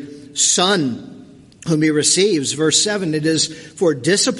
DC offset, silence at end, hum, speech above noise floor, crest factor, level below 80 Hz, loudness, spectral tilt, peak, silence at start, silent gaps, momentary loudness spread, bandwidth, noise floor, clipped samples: under 0.1%; 0 s; none; 25 dB; 18 dB; -60 dBFS; -16 LUFS; -3 dB/octave; 0 dBFS; 0 s; none; 9 LU; 11.5 kHz; -42 dBFS; under 0.1%